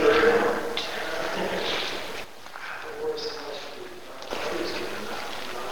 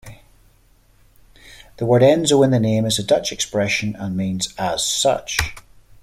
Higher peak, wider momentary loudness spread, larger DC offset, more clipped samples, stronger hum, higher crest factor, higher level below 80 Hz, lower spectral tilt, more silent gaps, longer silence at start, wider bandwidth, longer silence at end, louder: second, -8 dBFS vs -2 dBFS; first, 15 LU vs 10 LU; first, 1% vs under 0.1%; neither; neither; about the same, 20 dB vs 18 dB; second, -56 dBFS vs -44 dBFS; second, -3 dB/octave vs -4.5 dB/octave; neither; about the same, 0 s vs 0.05 s; first, over 20 kHz vs 16 kHz; second, 0 s vs 0.45 s; second, -28 LUFS vs -18 LUFS